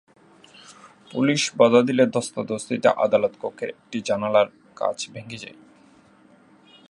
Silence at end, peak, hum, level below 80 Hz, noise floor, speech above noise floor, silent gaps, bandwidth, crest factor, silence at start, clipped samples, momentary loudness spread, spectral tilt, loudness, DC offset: 1.4 s; -2 dBFS; none; -70 dBFS; -54 dBFS; 32 dB; none; 11.5 kHz; 22 dB; 1.15 s; under 0.1%; 16 LU; -4.5 dB/octave; -22 LUFS; under 0.1%